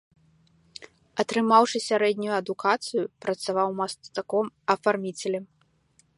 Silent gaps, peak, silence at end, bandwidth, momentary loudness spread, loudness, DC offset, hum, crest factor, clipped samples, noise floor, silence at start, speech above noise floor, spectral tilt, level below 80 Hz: none; -4 dBFS; 0.7 s; 11.5 kHz; 15 LU; -26 LUFS; under 0.1%; none; 22 dB; under 0.1%; -65 dBFS; 0.8 s; 39 dB; -4 dB/octave; -74 dBFS